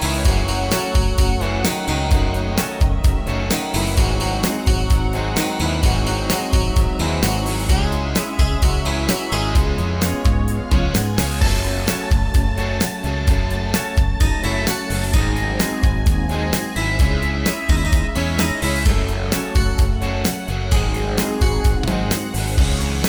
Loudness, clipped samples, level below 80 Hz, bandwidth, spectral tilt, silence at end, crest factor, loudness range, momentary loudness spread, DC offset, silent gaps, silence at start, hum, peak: -19 LUFS; under 0.1%; -20 dBFS; over 20 kHz; -5 dB/octave; 0 s; 12 dB; 1 LU; 3 LU; under 0.1%; none; 0 s; none; -4 dBFS